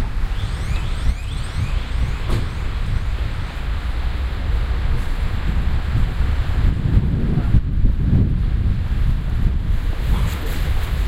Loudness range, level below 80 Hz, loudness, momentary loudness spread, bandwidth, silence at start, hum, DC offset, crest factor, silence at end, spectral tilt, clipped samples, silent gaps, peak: 5 LU; -20 dBFS; -22 LUFS; 7 LU; 15 kHz; 0 s; none; under 0.1%; 16 dB; 0 s; -7 dB/octave; under 0.1%; none; -4 dBFS